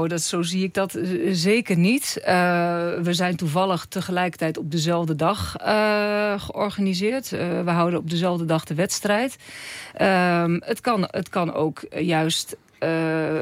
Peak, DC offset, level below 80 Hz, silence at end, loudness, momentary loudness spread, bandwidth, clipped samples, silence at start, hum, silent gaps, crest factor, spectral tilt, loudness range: -6 dBFS; under 0.1%; -58 dBFS; 0 s; -23 LUFS; 7 LU; 16 kHz; under 0.1%; 0 s; none; none; 16 dB; -5 dB/octave; 2 LU